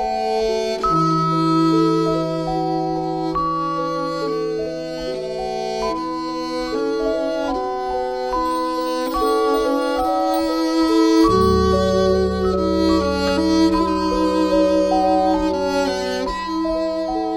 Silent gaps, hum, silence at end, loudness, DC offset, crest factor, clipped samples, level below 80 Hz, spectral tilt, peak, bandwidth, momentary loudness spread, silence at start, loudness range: none; none; 0 s; -19 LUFS; 0.2%; 14 dB; under 0.1%; -38 dBFS; -6 dB/octave; -4 dBFS; 16.5 kHz; 7 LU; 0 s; 6 LU